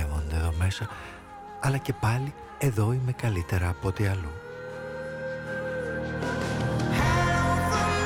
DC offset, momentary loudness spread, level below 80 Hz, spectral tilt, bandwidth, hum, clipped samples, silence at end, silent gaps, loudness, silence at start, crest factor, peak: under 0.1%; 13 LU; -38 dBFS; -6 dB/octave; 16.5 kHz; none; under 0.1%; 0 s; none; -28 LUFS; 0 s; 14 dB; -14 dBFS